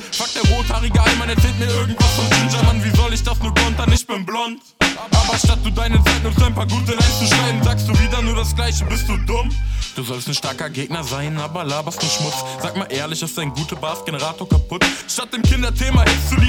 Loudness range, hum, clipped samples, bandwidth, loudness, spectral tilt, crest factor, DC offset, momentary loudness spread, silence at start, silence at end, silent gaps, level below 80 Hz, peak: 6 LU; none; under 0.1%; 18 kHz; -18 LUFS; -4.5 dB/octave; 14 dB; under 0.1%; 9 LU; 0 s; 0 s; none; -22 dBFS; -4 dBFS